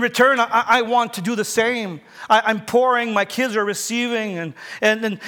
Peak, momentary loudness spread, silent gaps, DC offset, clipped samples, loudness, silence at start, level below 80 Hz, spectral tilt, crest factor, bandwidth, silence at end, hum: -4 dBFS; 10 LU; none; under 0.1%; under 0.1%; -19 LUFS; 0 s; -68 dBFS; -3.5 dB/octave; 16 dB; 19.5 kHz; 0 s; none